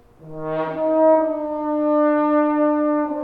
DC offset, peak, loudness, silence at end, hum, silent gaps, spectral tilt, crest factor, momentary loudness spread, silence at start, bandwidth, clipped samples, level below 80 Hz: under 0.1%; -6 dBFS; -19 LUFS; 0 s; none; none; -9.5 dB/octave; 14 dB; 10 LU; 0.25 s; 4.1 kHz; under 0.1%; -56 dBFS